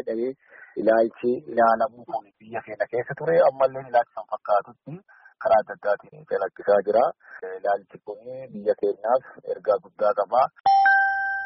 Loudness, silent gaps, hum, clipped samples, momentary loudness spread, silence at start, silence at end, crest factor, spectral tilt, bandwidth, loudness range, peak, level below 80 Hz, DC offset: -23 LUFS; 10.60-10.64 s; none; under 0.1%; 17 LU; 0.05 s; 0 s; 16 dB; -3.5 dB/octave; 5.8 kHz; 3 LU; -8 dBFS; -68 dBFS; under 0.1%